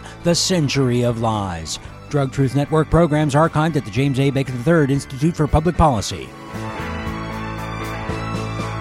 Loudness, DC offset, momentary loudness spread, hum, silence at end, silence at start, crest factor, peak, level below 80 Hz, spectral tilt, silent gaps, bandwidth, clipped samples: -19 LUFS; under 0.1%; 11 LU; none; 0 s; 0 s; 16 dB; -2 dBFS; -34 dBFS; -5.5 dB/octave; none; 14 kHz; under 0.1%